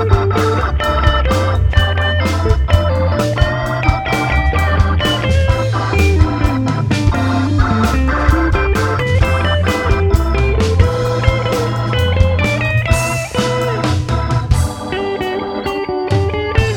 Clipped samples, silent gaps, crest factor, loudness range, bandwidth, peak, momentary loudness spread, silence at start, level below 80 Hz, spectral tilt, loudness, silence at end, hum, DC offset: under 0.1%; none; 14 dB; 2 LU; 17 kHz; 0 dBFS; 3 LU; 0 s; -20 dBFS; -6 dB/octave; -15 LUFS; 0 s; none; under 0.1%